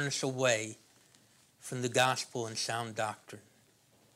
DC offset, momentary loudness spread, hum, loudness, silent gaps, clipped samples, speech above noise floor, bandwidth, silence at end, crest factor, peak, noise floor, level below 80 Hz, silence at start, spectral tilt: under 0.1%; 21 LU; none; -33 LUFS; none; under 0.1%; 33 dB; 16 kHz; 0.75 s; 24 dB; -12 dBFS; -66 dBFS; -84 dBFS; 0 s; -3 dB/octave